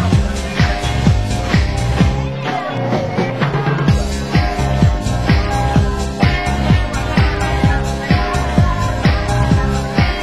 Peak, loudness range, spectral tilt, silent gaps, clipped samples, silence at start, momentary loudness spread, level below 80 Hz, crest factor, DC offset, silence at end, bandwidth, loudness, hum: 0 dBFS; 1 LU; -6 dB/octave; none; under 0.1%; 0 s; 3 LU; -20 dBFS; 14 dB; 0.7%; 0 s; 12.5 kHz; -16 LUFS; none